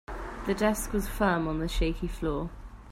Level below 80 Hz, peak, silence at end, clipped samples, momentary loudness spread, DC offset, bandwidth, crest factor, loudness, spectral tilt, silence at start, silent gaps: -36 dBFS; -12 dBFS; 0 s; under 0.1%; 11 LU; under 0.1%; 16 kHz; 18 dB; -30 LUFS; -5.5 dB/octave; 0.1 s; none